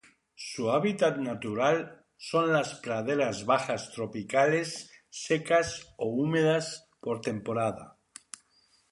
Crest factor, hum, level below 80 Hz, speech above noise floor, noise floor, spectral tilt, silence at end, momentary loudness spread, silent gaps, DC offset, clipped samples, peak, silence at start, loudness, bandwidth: 20 dB; none; -66 dBFS; 38 dB; -67 dBFS; -5 dB/octave; 1 s; 18 LU; none; under 0.1%; under 0.1%; -10 dBFS; 0.4 s; -29 LUFS; 11.5 kHz